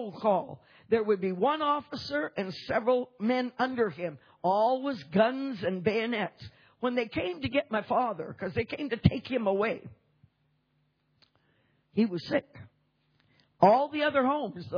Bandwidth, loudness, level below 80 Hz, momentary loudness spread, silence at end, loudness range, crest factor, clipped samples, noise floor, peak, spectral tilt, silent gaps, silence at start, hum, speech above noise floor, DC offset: 5.4 kHz; -29 LUFS; -58 dBFS; 8 LU; 0 s; 5 LU; 22 dB; under 0.1%; -73 dBFS; -8 dBFS; -7.5 dB/octave; none; 0 s; none; 45 dB; under 0.1%